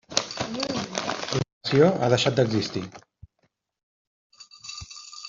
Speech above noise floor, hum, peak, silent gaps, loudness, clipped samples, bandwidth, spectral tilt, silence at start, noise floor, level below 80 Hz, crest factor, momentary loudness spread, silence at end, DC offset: 50 dB; none; -2 dBFS; 1.53-1.61 s, 3.83-4.30 s; -24 LUFS; under 0.1%; 7.8 kHz; -4.5 dB/octave; 0.1 s; -72 dBFS; -58 dBFS; 24 dB; 18 LU; 0 s; under 0.1%